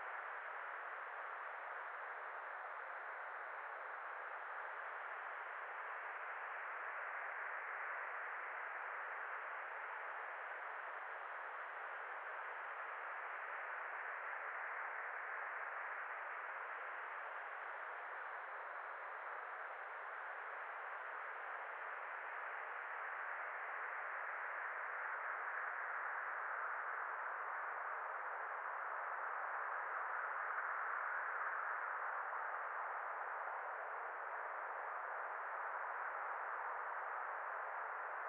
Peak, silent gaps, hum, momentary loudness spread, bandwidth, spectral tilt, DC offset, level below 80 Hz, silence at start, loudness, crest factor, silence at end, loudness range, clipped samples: -30 dBFS; none; none; 5 LU; 4.5 kHz; 5.5 dB/octave; under 0.1%; under -90 dBFS; 0 s; -45 LUFS; 16 dB; 0 s; 5 LU; under 0.1%